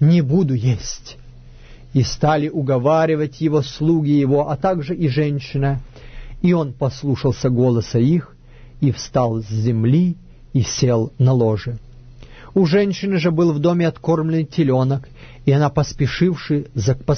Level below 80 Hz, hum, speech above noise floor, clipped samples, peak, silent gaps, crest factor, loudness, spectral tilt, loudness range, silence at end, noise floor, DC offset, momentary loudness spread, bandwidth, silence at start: -40 dBFS; none; 23 dB; under 0.1%; -4 dBFS; none; 14 dB; -18 LUFS; -7 dB/octave; 2 LU; 0 s; -40 dBFS; under 0.1%; 6 LU; 6.6 kHz; 0 s